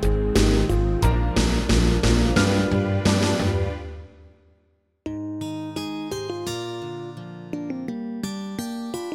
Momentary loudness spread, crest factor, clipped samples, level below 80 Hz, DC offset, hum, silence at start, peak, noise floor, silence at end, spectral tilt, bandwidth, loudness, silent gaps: 15 LU; 18 dB; under 0.1%; -28 dBFS; under 0.1%; none; 0 s; -6 dBFS; -65 dBFS; 0 s; -5.5 dB/octave; 15 kHz; -24 LUFS; none